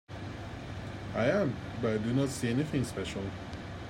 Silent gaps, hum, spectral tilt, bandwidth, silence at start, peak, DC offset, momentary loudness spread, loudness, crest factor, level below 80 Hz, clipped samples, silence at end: none; none; -6 dB/octave; 16 kHz; 0.1 s; -14 dBFS; under 0.1%; 12 LU; -33 LUFS; 18 dB; -52 dBFS; under 0.1%; 0 s